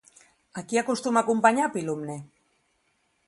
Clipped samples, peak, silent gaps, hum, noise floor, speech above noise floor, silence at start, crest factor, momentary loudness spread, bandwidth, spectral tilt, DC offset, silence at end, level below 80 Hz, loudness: under 0.1%; -6 dBFS; none; none; -71 dBFS; 46 dB; 0.55 s; 22 dB; 19 LU; 11.5 kHz; -4.5 dB/octave; under 0.1%; 1 s; -74 dBFS; -25 LUFS